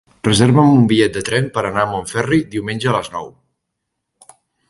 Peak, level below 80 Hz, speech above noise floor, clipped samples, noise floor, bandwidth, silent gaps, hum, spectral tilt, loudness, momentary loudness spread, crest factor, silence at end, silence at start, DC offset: 0 dBFS; -46 dBFS; 61 dB; under 0.1%; -76 dBFS; 11.5 kHz; none; none; -5.5 dB/octave; -15 LUFS; 12 LU; 16 dB; 1.4 s; 0.25 s; under 0.1%